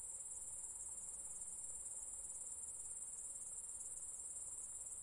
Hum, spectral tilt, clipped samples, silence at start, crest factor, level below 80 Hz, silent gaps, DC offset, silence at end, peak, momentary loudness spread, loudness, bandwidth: none; -0.5 dB/octave; under 0.1%; 0 s; 14 dB; -72 dBFS; none; under 0.1%; 0 s; -34 dBFS; 0 LU; -47 LUFS; 12 kHz